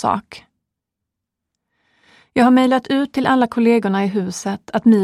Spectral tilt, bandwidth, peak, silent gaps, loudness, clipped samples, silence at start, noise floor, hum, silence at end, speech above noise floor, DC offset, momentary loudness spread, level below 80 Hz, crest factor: -6 dB/octave; 12.5 kHz; -2 dBFS; none; -17 LUFS; under 0.1%; 0 s; -81 dBFS; none; 0 s; 66 dB; under 0.1%; 10 LU; -58 dBFS; 16 dB